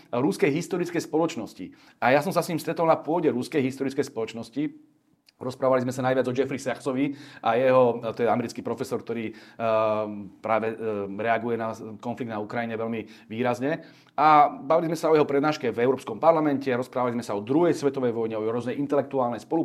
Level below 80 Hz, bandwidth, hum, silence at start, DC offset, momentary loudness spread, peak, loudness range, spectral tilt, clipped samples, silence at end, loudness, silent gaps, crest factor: -72 dBFS; 15 kHz; none; 0.1 s; under 0.1%; 12 LU; -4 dBFS; 5 LU; -6 dB/octave; under 0.1%; 0 s; -25 LUFS; none; 20 dB